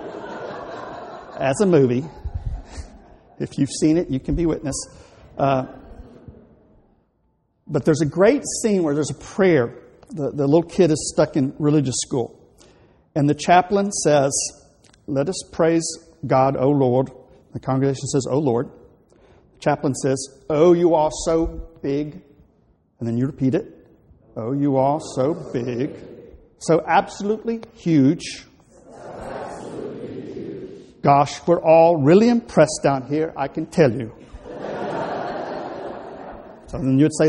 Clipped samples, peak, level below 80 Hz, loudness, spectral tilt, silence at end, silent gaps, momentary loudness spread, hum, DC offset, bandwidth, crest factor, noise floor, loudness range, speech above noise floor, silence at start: under 0.1%; -2 dBFS; -44 dBFS; -20 LUFS; -6 dB/octave; 0 s; none; 17 LU; none; under 0.1%; 12 kHz; 20 dB; -66 dBFS; 8 LU; 47 dB; 0 s